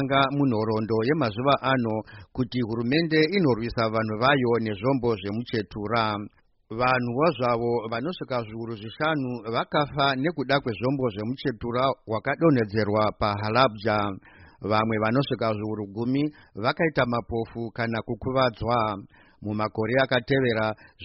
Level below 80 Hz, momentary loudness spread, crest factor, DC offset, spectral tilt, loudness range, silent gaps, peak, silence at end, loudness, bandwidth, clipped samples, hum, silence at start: -52 dBFS; 9 LU; 20 dB; under 0.1%; -4.5 dB/octave; 3 LU; none; -6 dBFS; 0 s; -25 LUFS; 6 kHz; under 0.1%; none; 0 s